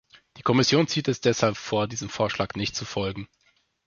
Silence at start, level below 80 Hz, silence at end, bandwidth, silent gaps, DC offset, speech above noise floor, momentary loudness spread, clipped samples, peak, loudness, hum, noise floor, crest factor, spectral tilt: 0.35 s; -54 dBFS; 0.6 s; 7.4 kHz; none; under 0.1%; 42 dB; 10 LU; under 0.1%; -6 dBFS; -25 LUFS; none; -67 dBFS; 20 dB; -4.5 dB/octave